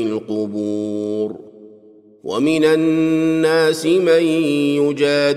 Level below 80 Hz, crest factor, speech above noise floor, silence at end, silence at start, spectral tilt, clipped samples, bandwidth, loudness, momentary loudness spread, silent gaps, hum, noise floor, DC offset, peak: -66 dBFS; 14 dB; 30 dB; 0 s; 0 s; -5.5 dB/octave; under 0.1%; 14 kHz; -17 LUFS; 9 LU; none; none; -46 dBFS; under 0.1%; -4 dBFS